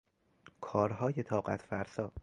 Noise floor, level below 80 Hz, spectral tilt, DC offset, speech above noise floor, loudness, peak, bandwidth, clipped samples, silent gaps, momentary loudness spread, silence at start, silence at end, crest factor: -63 dBFS; -60 dBFS; -8 dB/octave; under 0.1%; 29 dB; -36 LUFS; -16 dBFS; 11 kHz; under 0.1%; none; 7 LU; 0.6 s; 0 s; 22 dB